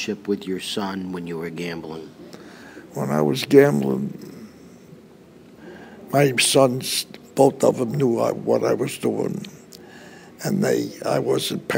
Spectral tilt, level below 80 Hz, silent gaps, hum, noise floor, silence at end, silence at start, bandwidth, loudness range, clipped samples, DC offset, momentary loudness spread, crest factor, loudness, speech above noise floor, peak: -4.5 dB/octave; -64 dBFS; none; none; -47 dBFS; 0 s; 0 s; 16 kHz; 5 LU; under 0.1%; under 0.1%; 25 LU; 22 dB; -21 LUFS; 26 dB; 0 dBFS